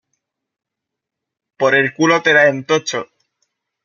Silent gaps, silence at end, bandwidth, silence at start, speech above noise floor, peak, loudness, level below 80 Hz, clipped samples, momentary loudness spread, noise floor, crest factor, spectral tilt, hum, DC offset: none; 0.8 s; 7.2 kHz; 1.6 s; 67 dB; -2 dBFS; -14 LUFS; -66 dBFS; under 0.1%; 10 LU; -82 dBFS; 16 dB; -4 dB/octave; none; under 0.1%